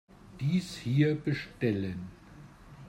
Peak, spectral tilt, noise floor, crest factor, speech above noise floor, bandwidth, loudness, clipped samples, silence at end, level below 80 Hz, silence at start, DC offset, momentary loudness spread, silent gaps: -14 dBFS; -7 dB/octave; -52 dBFS; 18 dB; 22 dB; 12.5 kHz; -31 LUFS; under 0.1%; 0 s; -60 dBFS; 0.25 s; under 0.1%; 11 LU; none